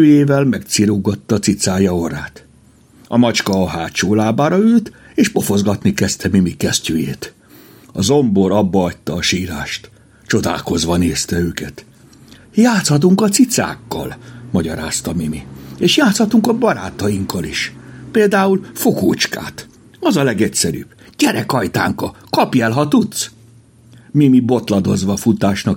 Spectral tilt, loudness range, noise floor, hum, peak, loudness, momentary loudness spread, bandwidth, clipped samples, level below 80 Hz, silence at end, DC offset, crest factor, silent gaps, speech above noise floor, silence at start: -5 dB/octave; 2 LU; -47 dBFS; none; 0 dBFS; -16 LUFS; 12 LU; 17 kHz; under 0.1%; -46 dBFS; 0 s; under 0.1%; 16 dB; none; 33 dB; 0 s